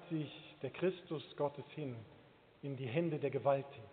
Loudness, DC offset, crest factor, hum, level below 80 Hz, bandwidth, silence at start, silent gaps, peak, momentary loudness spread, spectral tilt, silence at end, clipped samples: -40 LUFS; under 0.1%; 20 dB; none; -80 dBFS; 4.6 kHz; 0 s; none; -20 dBFS; 12 LU; -6 dB/octave; 0 s; under 0.1%